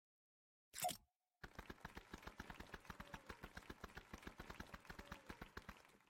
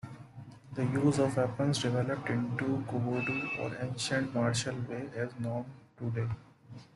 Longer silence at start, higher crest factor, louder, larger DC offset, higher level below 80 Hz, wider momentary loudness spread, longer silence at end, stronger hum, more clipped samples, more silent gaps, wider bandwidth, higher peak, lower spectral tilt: first, 0.75 s vs 0.05 s; first, 24 dB vs 18 dB; second, -55 LUFS vs -33 LUFS; neither; about the same, -66 dBFS vs -64 dBFS; second, 11 LU vs 16 LU; about the same, 0 s vs 0.1 s; neither; neither; first, 1.16-1.20 s vs none; first, 16.5 kHz vs 12 kHz; second, -32 dBFS vs -16 dBFS; second, -3 dB/octave vs -5.5 dB/octave